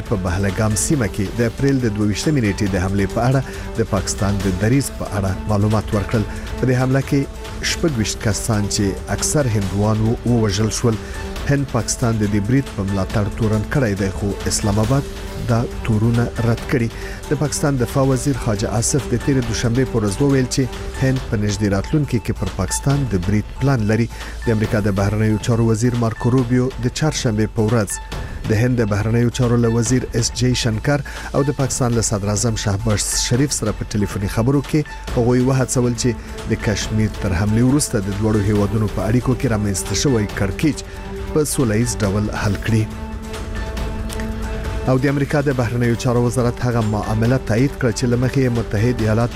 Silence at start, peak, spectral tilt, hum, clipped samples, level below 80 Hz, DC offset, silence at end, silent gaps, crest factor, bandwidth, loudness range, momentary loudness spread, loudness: 0 s; -8 dBFS; -5.5 dB/octave; none; under 0.1%; -30 dBFS; under 0.1%; 0 s; none; 12 dB; 15.5 kHz; 2 LU; 6 LU; -19 LUFS